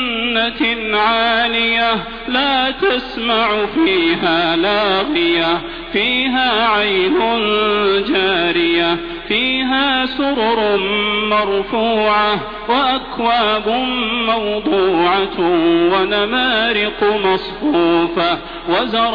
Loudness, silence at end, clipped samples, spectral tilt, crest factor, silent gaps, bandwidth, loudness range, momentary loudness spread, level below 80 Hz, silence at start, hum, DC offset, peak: -15 LUFS; 0 s; under 0.1%; -6.5 dB/octave; 14 dB; none; 5.2 kHz; 1 LU; 4 LU; -40 dBFS; 0 s; none; under 0.1%; -2 dBFS